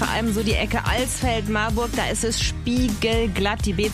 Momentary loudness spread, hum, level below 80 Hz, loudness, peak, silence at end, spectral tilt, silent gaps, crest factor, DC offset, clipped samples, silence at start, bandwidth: 2 LU; none; -30 dBFS; -22 LUFS; -8 dBFS; 0 s; -4 dB/octave; none; 14 dB; under 0.1%; under 0.1%; 0 s; 15.5 kHz